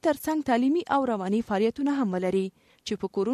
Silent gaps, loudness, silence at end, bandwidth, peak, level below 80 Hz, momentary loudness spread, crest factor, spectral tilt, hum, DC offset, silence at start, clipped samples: none; -27 LUFS; 0 s; 13.5 kHz; -10 dBFS; -62 dBFS; 9 LU; 16 dB; -6 dB/octave; none; under 0.1%; 0.05 s; under 0.1%